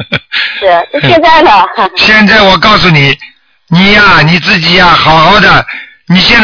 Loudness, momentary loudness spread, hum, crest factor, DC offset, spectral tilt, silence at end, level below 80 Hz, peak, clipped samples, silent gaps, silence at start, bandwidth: -4 LUFS; 8 LU; none; 6 dB; under 0.1%; -5.5 dB/octave; 0 s; -28 dBFS; 0 dBFS; 9%; none; 0 s; 5.4 kHz